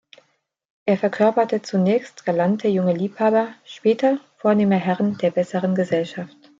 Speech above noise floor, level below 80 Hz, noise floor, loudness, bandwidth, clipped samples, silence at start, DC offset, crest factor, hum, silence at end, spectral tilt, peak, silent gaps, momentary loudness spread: 47 dB; -68 dBFS; -67 dBFS; -21 LUFS; 7.6 kHz; under 0.1%; 0.85 s; under 0.1%; 16 dB; none; 0.35 s; -7.5 dB/octave; -6 dBFS; none; 6 LU